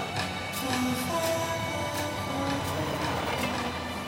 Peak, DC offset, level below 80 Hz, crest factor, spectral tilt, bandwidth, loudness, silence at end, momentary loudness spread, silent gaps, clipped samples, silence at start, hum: -16 dBFS; under 0.1%; -52 dBFS; 14 dB; -4 dB/octave; over 20 kHz; -30 LUFS; 0 s; 3 LU; none; under 0.1%; 0 s; none